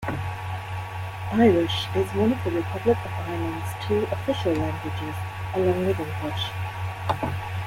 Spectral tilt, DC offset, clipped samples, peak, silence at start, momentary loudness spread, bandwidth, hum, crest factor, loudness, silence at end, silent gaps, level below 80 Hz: -6.5 dB/octave; under 0.1%; under 0.1%; -8 dBFS; 0 s; 10 LU; 16.5 kHz; none; 18 dB; -26 LUFS; 0 s; none; -50 dBFS